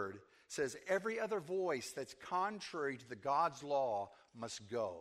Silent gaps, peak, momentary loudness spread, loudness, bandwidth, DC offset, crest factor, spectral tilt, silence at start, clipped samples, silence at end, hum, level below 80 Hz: none; -22 dBFS; 11 LU; -40 LUFS; 15.5 kHz; under 0.1%; 18 dB; -4 dB/octave; 0 s; under 0.1%; 0 s; none; -80 dBFS